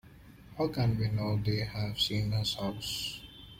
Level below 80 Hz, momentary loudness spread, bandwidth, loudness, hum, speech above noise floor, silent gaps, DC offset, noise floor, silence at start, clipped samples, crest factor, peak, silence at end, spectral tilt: -52 dBFS; 6 LU; 16.5 kHz; -32 LUFS; none; 22 dB; none; under 0.1%; -53 dBFS; 0.05 s; under 0.1%; 16 dB; -18 dBFS; 0 s; -5.5 dB/octave